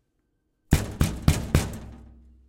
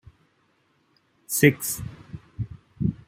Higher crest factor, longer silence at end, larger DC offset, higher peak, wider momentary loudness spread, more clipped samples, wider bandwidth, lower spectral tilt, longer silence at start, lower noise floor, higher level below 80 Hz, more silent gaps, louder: about the same, 24 dB vs 26 dB; first, 0.45 s vs 0.15 s; neither; about the same, -2 dBFS vs -2 dBFS; second, 15 LU vs 21 LU; neither; about the same, 17 kHz vs 16 kHz; about the same, -5.5 dB/octave vs -5 dB/octave; second, 0.7 s vs 1.3 s; first, -73 dBFS vs -67 dBFS; first, -32 dBFS vs -50 dBFS; neither; about the same, -26 LUFS vs -25 LUFS